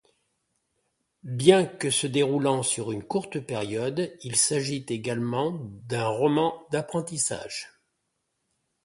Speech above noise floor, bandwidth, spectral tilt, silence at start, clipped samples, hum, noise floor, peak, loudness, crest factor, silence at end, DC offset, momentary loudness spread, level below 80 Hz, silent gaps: 52 dB; 11.5 kHz; -4 dB/octave; 1.25 s; under 0.1%; none; -78 dBFS; -2 dBFS; -26 LUFS; 24 dB; 1.2 s; under 0.1%; 10 LU; -66 dBFS; none